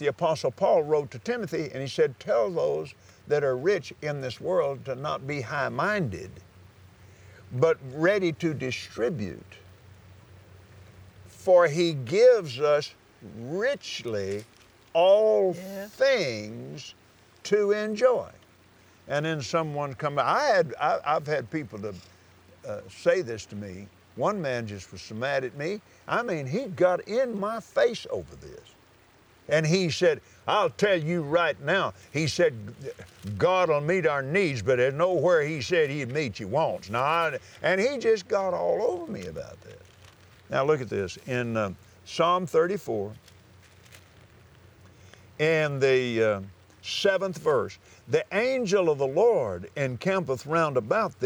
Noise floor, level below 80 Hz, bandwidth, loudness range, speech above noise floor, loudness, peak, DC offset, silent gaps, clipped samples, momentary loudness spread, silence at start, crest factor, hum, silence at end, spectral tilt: -58 dBFS; -66 dBFS; over 20 kHz; 6 LU; 32 dB; -26 LUFS; -8 dBFS; under 0.1%; none; under 0.1%; 15 LU; 0 s; 18 dB; none; 0 s; -5.5 dB/octave